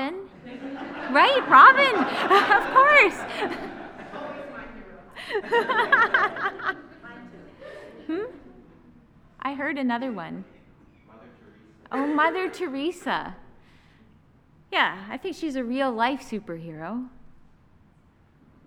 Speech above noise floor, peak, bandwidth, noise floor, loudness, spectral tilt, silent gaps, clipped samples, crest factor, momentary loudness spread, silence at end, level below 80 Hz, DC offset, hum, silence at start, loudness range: 36 dB; -2 dBFS; 14 kHz; -58 dBFS; -21 LUFS; -4 dB/octave; none; under 0.1%; 24 dB; 24 LU; 1.6 s; -58 dBFS; under 0.1%; none; 0 s; 15 LU